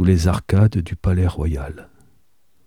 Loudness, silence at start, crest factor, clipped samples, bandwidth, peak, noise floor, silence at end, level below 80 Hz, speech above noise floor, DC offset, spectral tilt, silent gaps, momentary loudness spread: -19 LUFS; 0 s; 16 dB; under 0.1%; 12 kHz; -2 dBFS; -65 dBFS; 0.85 s; -30 dBFS; 47 dB; 0.3%; -7.5 dB/octave; none; 13 LU